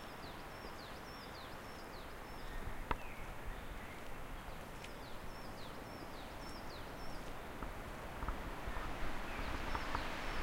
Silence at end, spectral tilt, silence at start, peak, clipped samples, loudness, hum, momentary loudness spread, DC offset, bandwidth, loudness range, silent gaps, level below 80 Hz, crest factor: 0 s; -4.5 dB/octave; 0 s; -22 dBFS; under 0.1%; -47 LUFS; none; 8 LU; under 0.1%; 16 kHz; 5 LU; none; -48 dBFS; 22 dB